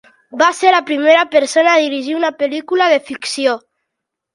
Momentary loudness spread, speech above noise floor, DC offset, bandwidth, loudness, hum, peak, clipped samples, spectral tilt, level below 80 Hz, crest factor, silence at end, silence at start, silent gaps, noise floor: 8 LU; 64 dB; under 0.1%; 11.5 kHz; -14 LUFS; none; 0 dBFS; under 0.1%; -1.5 dB/octave; -68 dBFS; 14 dB; 0.75 s; 0.35 s; none; -78 dBFS